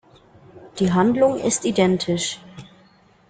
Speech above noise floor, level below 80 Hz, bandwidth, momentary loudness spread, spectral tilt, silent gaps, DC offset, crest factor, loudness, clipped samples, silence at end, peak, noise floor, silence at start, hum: 35 dB; -54 dBFS; 9.6 kHz; 11 LU; -5 dB/octave; none; under 0.1%; 18 dB; -20 LUFS; under 0.1%; 0.65 s; -4 dBFS; -54 dBFS; 0.55 s; none